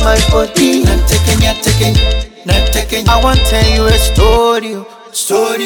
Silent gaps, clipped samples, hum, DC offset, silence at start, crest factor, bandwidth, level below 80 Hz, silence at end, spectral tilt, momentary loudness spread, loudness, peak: none; under 0.1%; none; under 0.1%; 0 s; 10 dB; 19.5 kHz; -14 dBFS; 0 s; -4.5 dB/octave; 7 LU; -11 LUFS; 0 dBFS